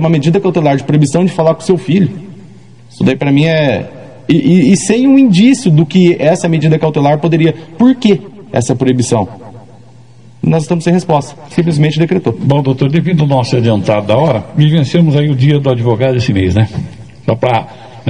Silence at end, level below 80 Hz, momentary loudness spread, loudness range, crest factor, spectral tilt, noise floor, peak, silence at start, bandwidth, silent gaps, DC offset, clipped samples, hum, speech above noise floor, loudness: 0 s; -46 dBFS; 8 LU; 5 LU; 10 dB; -7 dB/octave; -39 dBFS; 0 dBFS; 0 s; 10.5 kHz; none; 0.9%; 0.4%; none; 29 dB; -11 LUFS